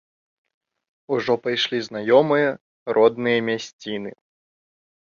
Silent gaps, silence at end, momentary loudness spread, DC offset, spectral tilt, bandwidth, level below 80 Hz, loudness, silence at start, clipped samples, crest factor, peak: 2.61-2.86 s, 3.73-3.79 s; 1.05 s; 13 LU; under 0.1%; -5 dB/octave; 7.4 kHz; -70 dBFS; -21 LUFS; 1.1 s; under 0.1%; 20 dB; -2 dBFS